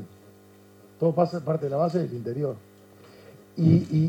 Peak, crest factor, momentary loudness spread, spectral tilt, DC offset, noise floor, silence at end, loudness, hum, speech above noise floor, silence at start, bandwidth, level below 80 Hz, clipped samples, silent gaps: -8 dBFS; 20 dB; 16 LU; -9.5 dB/octave; under 0.1%; -53 dBFS; 0 s; -25 LUFS; none; 29 dB; 0 s; 8 kHz; -70 dBFS; under 0.1%; none